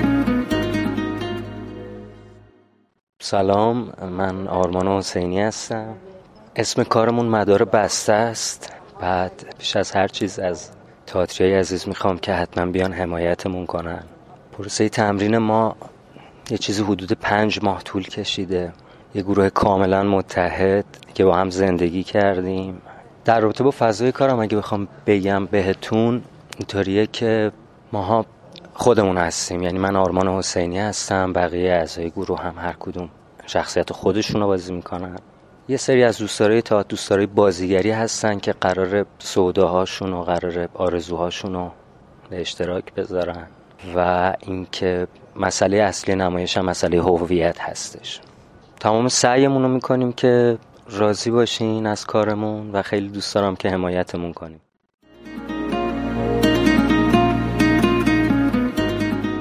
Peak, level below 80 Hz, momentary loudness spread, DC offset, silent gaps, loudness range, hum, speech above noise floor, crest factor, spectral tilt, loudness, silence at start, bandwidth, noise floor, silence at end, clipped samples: 0 dBFS; -42 dBFS; 12 LU; under 0.1%; 3.03-3.13 s, 54.94-54.98 s; 5 LU; none; 37 dB; 20 dB; -5 dB/octave; -20 LUFS; 0 s; 15.5 kHz; -57 dBFS; 0 s; under 0.1%